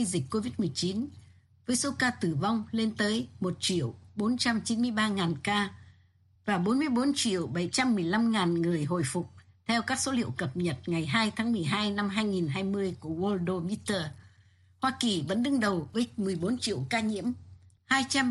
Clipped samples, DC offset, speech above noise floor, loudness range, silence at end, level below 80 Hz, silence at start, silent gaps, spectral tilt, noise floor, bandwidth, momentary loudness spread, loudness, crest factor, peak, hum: under 0.1%; under 0.1%; 34 dB; 2 LU; 0 s; -64 dBFS; 0 s; none; -4.5 dB/octave; -63 dBFS; 12 kHz; 6 LU; -29 LUFS; 18 dB; -10 dBFS; none